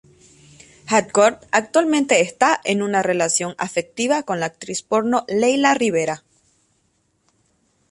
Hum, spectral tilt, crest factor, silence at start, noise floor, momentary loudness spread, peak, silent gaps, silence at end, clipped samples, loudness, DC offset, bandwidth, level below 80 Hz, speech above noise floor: none; -3.5 dB/octave; 18 dB; 0.85 s; -66 dBFS; 8 LU; -2 dBFS; none; 1.75 s; under 0.1%; -19 LUFS; under 0.1%; 11.5 kHz; -64 dBFS; 47 dB